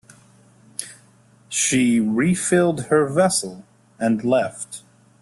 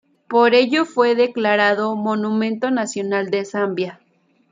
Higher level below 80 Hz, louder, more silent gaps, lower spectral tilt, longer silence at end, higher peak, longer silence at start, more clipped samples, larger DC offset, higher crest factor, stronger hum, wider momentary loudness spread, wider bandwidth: first, -60 dBFS vs -72 dBFS; about the same, -19 LUFS vs -18 LUFS; neither; about the same, -4.5 dB/octave vs -4.5 dB/octave; second, 0.4 s vs 0.55 s; about the same, -4 dBFS vs -2 dBFS; first, 0.8 s vs 0.3 s; neither; neither; about the same, 18 dB vs 16 dB; neither; first, 16 LU vs 8 LU; first, 12.5 kHz vs 9.4 kHz